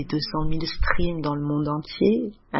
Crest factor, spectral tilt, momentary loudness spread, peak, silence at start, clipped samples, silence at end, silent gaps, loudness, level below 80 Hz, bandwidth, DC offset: 20 dB; -9.5 dB/octave; 5 LU; -4 dBFS; 0 s; under 0.1%; 0 s; none; -25 LUFS; -32 dBFS; 5.8 kHz; under 0.1%